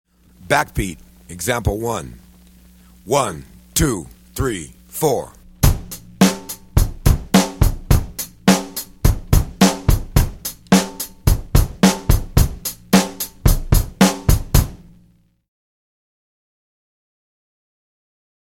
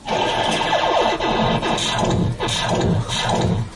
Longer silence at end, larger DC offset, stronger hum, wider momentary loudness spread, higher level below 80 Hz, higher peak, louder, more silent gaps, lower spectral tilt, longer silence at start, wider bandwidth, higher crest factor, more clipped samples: first, 3.7 s vs 0 s; neither; neither; first, 13 LU vs 2 LU; first, -24 dBFS vs -36 dBFS; first, 0 dBFS vs -4 dBFS; about the same, -19 LUFS vs -19 LUFS; neither; about the same, -5 dB/octave vs -4.5 dB/octave; first, 0.45 s vs 0 s; first, 17 kHz vs 11.5 kHz; about the same, 18 dB vs 14 dB; neither